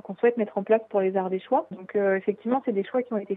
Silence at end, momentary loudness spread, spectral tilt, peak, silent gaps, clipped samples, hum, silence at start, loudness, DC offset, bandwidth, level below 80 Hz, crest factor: 0 s; 4 LU; -10 dB/octave; -8 dBFS; none; under 0.1%; none; 0.05 s; -26 LUFS; under 0.1%; 4 kHz; -84 dBFS; 18 dB